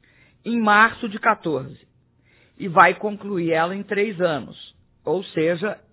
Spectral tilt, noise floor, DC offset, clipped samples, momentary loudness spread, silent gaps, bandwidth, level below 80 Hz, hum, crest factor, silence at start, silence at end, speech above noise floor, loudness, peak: -9 dB/octave; -59 dBFS; under 0.1%; under 0.1%; 18 LU; none; 4 kHz; -62 dBFS; none; 22 dB; 0.45 s; 0.15 s; 38 dB; -20 LUFS; 0 dBFS